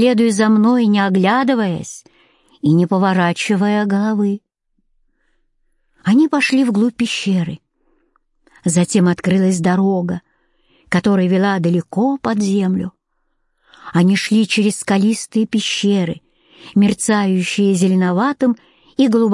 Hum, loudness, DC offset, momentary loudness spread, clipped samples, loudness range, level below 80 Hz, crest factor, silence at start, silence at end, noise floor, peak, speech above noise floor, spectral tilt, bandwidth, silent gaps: none; -16 LUFS; under 0.1%; 8 LU; under 0.1%; 2 LU; -58 dBFS; 14 dB; 0 s; 0 s; -67 dBFS; -2 dBFS; 52 dB; -5.5 dB/octave; 11.5 kHz; none